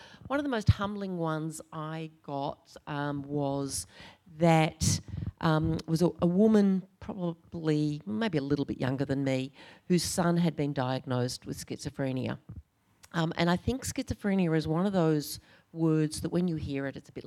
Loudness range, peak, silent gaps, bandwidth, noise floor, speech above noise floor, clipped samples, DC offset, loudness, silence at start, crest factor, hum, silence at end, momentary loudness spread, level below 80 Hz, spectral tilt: 6 LU; -10 dBFS; none; 15 kHz; -60 dBFS; 30 dB; under 0.1%; under 0.1%; -30 LUFS; 0 s; 20 dB; none; 0.05 s; 13 LU; -54 dBFS; -6 dB/octave